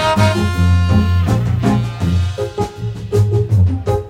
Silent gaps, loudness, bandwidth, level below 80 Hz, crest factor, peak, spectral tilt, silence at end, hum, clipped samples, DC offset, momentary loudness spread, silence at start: none; -16 LUFS; 12.5 kHz; -28 dBFS; 12 dB; -2 dBFS; -7 dB/octave; 0 s; none; under 0.1%; under 0.1%; 8 LU; 0 s